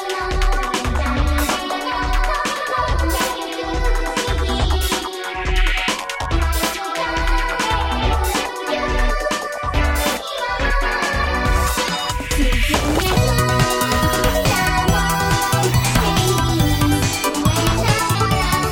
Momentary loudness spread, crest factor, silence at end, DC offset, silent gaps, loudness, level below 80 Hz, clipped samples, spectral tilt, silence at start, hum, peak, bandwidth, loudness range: 5 LU; 16 dB; 0 s; under 0.1%; none; -19 LUFS; -24 dBFS; under 0.1%; -4 dB/octave; 0 s; none; -2 dBFS; 17 kHz; 4 LU